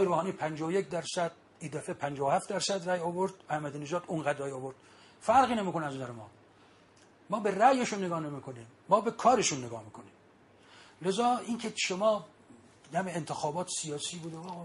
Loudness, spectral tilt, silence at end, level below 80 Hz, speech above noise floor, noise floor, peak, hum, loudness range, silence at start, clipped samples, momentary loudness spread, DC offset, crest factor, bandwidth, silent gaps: -31 LUFS; -4 dB/octave; 0 s; -72 dBFS; 29 dB; -60 dBFS; -10 dBFS; none; 4 LU; 0 s; under 0.1%; 16 LU; under 0.1%; 22 dB; 11.5 kHz; none